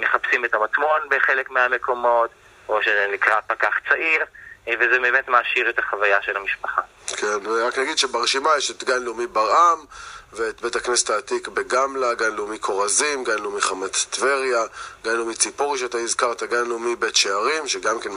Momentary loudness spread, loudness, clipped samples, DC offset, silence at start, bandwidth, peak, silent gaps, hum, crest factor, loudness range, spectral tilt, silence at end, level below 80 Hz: 8 LU; -21 LUFS; under 0.1%; under 0.1%; 0 s; 15 kHz; 0 dBFS; none; none; 22 dB; 3 LU; 0 dB/octave; 0 s; -60 dBFS